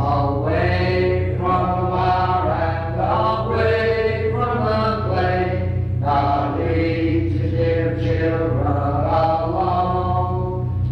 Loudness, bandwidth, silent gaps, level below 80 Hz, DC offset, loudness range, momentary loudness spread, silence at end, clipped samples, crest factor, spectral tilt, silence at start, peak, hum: -20 LUFS; 5.8 kHz; none; -36 dBFS; under 0.1%; 1 LU; 3 LU; 0 s; under 0.1%; 12 dB; -9 dB/octave; 0 s; -6 dBFS; none